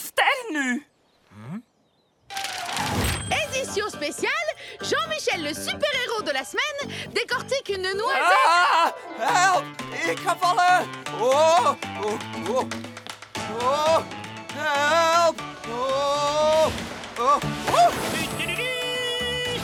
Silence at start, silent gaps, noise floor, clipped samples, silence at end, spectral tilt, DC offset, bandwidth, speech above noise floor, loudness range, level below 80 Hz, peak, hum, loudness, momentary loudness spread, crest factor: 0 s; none; -65 dBFS; under 0.1%; 0 s; -3 dB/octave; under 0.1%; 19 kHz; 43 dB; 6 LU; -50 dBFS; -6 dBFS; none; -23 LUFS; 13 LU; 18 dB